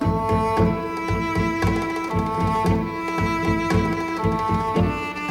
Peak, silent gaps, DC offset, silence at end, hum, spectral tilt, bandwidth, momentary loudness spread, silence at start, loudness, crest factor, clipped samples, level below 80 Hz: -8 dBFS; none; under 0.1%; 0 s; none; -7 dB/octave; 16.5 kHz; 4 LU; 0 s; -22 LUFS; 14 dB; under 0.1%; -36 dBFS